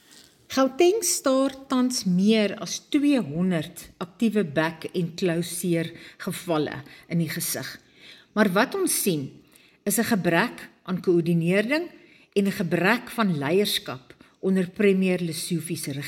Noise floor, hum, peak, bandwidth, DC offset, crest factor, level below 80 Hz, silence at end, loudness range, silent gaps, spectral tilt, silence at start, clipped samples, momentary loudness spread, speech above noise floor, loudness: -53 dBFS; none; -6 dBFS; 17 kHz; under 0.1%; 18 dB; -64 dBFS; 0 s; 4 LU; none; -4.5 dB/octave; 0.5 s; under 0.1%; 12 LU; 29 dB; -24 LUFS